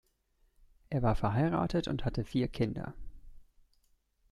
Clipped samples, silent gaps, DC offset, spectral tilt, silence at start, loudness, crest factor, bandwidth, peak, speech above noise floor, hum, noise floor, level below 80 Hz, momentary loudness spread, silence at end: under 0.1%; none; under 0.1%; -8 dB/octave; 0.9 s; -33 LUFS; 18 dB; 12 kHz; -16 dBFS; 41 dB; none; -72 dBFS; -46 dBFS; 7 LU; 0.9 s